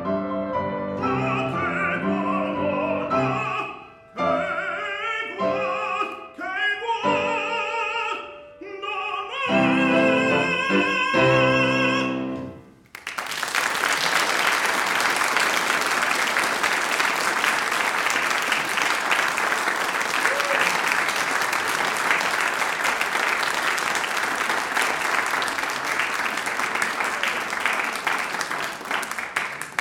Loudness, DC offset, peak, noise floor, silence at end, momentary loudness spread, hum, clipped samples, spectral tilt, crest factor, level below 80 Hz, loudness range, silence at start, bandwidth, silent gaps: -22 LUFS; under 0.1%; -4 dBFS; -44 dBFS; 0 s; 8 LU; none; under 0.1%; -3 dB/octave; 18 dB; -60 dBFS; 5 LU; 0 s; 17 kHz; none